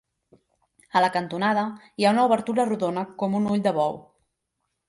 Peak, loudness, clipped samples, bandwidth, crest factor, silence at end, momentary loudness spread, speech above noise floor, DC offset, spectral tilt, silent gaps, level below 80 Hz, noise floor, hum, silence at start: -8 dBFS; -24 LUFS; under 0.1%; 11.5 kHz; 18 dB; 0.85 s; 7 LU; 56 dB; under 0.1%; -6 dB/octave; none; -68 dBFS; -79 dBFS; none; 0.95 s